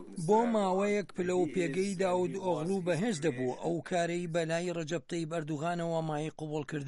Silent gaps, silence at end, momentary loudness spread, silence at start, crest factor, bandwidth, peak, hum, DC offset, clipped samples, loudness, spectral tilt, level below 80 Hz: none; 0 s; 7 LU; 0 s; 16 dB; 11.5 kHz; -16 dBFS; none; under 0.1%; under 0.1%; -32 LUFS; -6 dB/octave; -68 dBFS